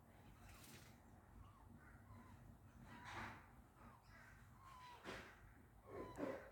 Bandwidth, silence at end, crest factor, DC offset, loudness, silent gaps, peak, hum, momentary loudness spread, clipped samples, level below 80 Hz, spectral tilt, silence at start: 19 kHz; 0 s; 24 dB; under 0.1%; -59 LUFS; none; -34 dBFS; none; 12 LU; under 0.1%; -70 dBFS; -5 dB/octave; 0 s